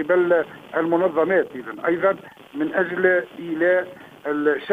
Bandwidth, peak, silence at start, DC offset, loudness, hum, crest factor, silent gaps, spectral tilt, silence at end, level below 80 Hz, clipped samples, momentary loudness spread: 4.7 kHz; -6 dBFS; 0 s; under 0.1%; -22 LUFS; none; 16 dB; none; -7.5 dB/octave; 0 s; -68 dBFS; under 0.1%; 11 LU